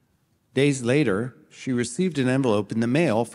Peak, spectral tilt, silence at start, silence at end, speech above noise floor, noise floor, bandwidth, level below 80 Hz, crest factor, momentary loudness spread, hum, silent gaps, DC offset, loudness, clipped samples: -8 dBFS; -6 dB/octave; 0.55 s; 0 s; 44 dB; -67 dBFS; 12 kHz; -66 dBFS; 16 dB; 8 LU; none; none; under 0.1%; -23 LUFS; under 0.1%